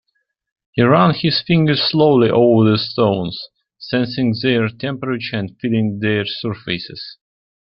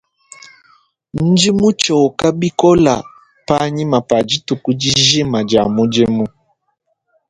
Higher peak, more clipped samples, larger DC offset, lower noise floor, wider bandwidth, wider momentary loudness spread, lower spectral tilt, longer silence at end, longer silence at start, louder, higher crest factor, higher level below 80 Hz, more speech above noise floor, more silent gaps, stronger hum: about the same, 0 dBFS vs 0 dBFS; neither; neither; about the same, -70 dBFS vs -67 dBFS; second, 5.8 kHz vs 11 kHz; first, 13 LU vs 8 LU; first, -10 dB/octave vs -4.5 dB/octave; second, 0.65 s vs 1 s; second, 0.75 s vs 1.15 s; second, -17 LUFS vs -14 LUFS; about the same, 16 dB vs 16 dB; second, -54 dBFS vs -46 dBFS; about the same, 54 dB vs 54 dB; neither; neither